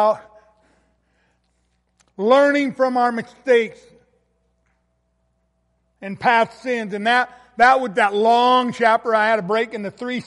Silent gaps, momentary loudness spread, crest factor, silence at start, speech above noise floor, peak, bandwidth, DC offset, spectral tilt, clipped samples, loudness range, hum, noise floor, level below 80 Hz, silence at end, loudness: none; 13 LU; 18 dB; 0 s; 50 dB; -2 dBFS; 11.5 kHz; under 0.1%; -4.5 dB/octave; under 0.1%; 8 LU; none; -67 dBFS; -64 dBFS; 0.05 s; -18 LUFS